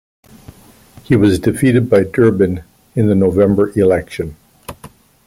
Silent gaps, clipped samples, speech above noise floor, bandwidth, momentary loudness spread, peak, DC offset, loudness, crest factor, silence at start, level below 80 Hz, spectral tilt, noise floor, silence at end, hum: none; under 0.1%; 30 dB; 16 kHz; 17 LU; -2 dBFS; under 0.1%; -14 LUFS; 14 dB; 1.1 s; -42 dBFS; -7.5 dB/octave; -43 dBFS; 0.55 s; none